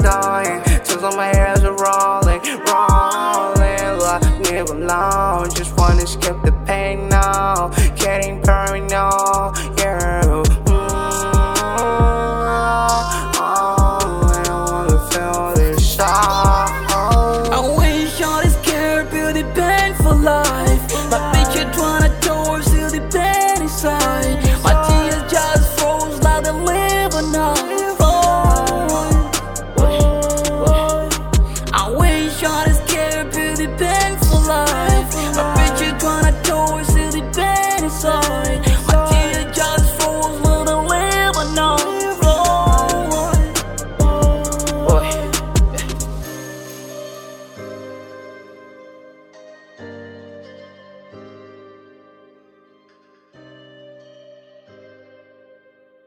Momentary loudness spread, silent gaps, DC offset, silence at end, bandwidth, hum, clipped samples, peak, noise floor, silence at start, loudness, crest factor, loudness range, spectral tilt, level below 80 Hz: 5 LU; none; under 0.1%; 4.7 s; 18.5 kHz; none; under 0.1%; 0 dBFS; -54 dBFS; 0 s; -16 LUFS; 16 dB; 2 LU; -4.5 dB/octave; -20 dBFS